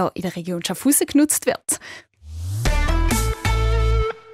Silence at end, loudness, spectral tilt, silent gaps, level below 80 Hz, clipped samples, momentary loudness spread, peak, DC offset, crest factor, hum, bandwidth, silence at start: 0 s; -21 LUFS; -4.5 dB/octave; none; -24 dBFS; under 0.1%; 13 LU; -4 dBFS; under 0.1%; 16 dB; none; 16 kHz; 0 s